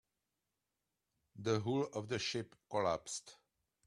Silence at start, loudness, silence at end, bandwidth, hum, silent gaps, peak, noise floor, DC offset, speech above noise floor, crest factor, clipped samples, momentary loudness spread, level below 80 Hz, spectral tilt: 1.35 s; -39 LUFS; 0.55 s; 12.5 kHz; none; none; -20 dBFS; -89 dBFS; under 0.1%; 51 dB; 20 dB; under 0.1%; 8 LU; -74 dBFS; -4.5 dB/octave